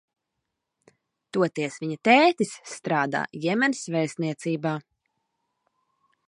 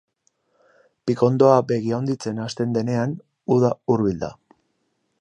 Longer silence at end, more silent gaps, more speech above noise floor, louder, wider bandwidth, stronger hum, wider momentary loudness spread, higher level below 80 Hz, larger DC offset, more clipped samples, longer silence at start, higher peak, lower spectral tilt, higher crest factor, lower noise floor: first, 1.5 s vs 0.9 s; neither; first, 58 dB vs 51 dB; second, -24 LUFS vs -21 LUFS; about the same, 11 kHz vs 10 kHz; neither; about the same, 12 LU vs 13 LU; second, -76 dBFS vs -56 dBFS; neither; neither; first, 1.35 s vs 1.05 s; about the same, -4 dBFS vs -2 dBFS; second, -5 dB/octave vs -7.5 dB/octave; about the same, 22 dB vs 20 dB; first, -82 dBFS vs -71 dBFS